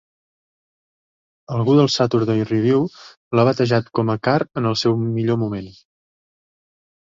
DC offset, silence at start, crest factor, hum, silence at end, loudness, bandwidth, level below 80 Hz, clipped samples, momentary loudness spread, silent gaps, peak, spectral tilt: under 0.1%; 1.5 s; 18 dB; none; 1.3 s; -19 LUFS; 7.6 kHz; -56 dBFS; under 0.1%; 9 LU; 3.17-3.31 s; -2 dBFS; -6.5 dB/octave